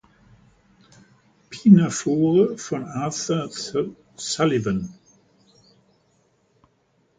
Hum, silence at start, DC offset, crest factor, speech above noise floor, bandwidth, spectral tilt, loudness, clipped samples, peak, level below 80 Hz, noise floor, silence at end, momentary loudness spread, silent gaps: none; 1.5 s; under 0.1%; 22 dB; 45 dB; 9.4 kHz; -6 dB/octave; -21 LUFS; under 0.1%; -2 dBFS; -58 dBFS; -65 dBFS; 2.25 s; 15 LU; none